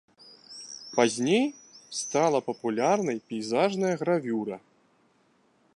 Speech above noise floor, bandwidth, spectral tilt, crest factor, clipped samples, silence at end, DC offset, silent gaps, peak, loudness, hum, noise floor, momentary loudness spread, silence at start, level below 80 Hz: 40 dB; 11.5 kHz; -4.5 dB/octave; 22 dB; under 0.1%; 1.2 s; under 0.1%; none; -8 dBFS; -27 LUFS; none; -66 dBFS; 15 LU; 0.5 s; -78 dBFS